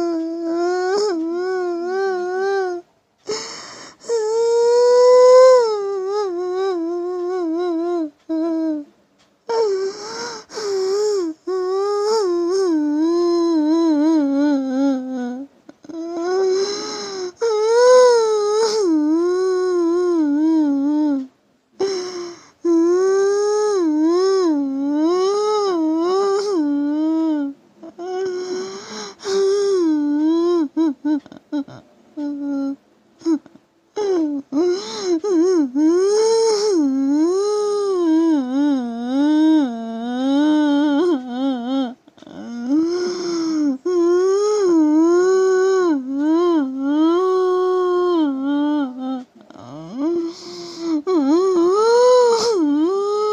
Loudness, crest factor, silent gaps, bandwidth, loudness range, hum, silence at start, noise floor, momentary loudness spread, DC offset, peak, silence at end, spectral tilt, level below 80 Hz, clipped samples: -18 LUFS; 16 dB; none; 9.8 kHz; 7 LU; none; 0 s; -58 dBFS; 13 LU; under 0.1%; -2 dBFS; 0 s; -3.5 dB/octave; -66 dBFS; under 0.1%